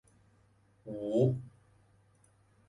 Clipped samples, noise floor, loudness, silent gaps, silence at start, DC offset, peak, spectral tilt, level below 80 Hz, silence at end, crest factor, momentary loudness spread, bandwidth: under 0.1%; -67 dBFS; -33 LUFS; none; 0.85 s; under 0.1%; -14 dBFS; -9.5 dB/octave; -68 dBFS; 1.2 s; 22 dB; 24 LU; 10.5 kHz